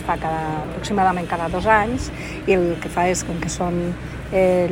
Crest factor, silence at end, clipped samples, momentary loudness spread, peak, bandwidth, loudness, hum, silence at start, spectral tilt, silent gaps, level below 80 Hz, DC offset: 18 dB; 0 s; under 0.1%; 9 LU; -2 dBFS; 16 kHz; -21 LUFS; none; 0 s; -5.5 dB/octave; none; -36 dBFS; under 0.1%